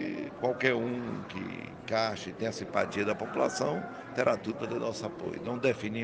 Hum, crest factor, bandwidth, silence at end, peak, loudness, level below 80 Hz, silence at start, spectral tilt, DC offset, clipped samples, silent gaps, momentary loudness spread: none; 22 dB; 9.8 kHz; 0 s; -10 dBFS; -32 LUFS; -66 dBFS; 0 s; -5 dB/octave; under 0.1%; under 0.1%; none; 9 LU